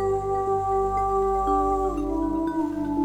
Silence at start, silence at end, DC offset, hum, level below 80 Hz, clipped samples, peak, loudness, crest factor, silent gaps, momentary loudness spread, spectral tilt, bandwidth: 0 s; 0 s; under 0.1%; 50 Hz at -40 dBFS; -38 dBFS; under 0.1%; -12 dBFS; -25 LUFS; 12 dB; none; 4 LU; -8 dB/octave; 11.5 kHz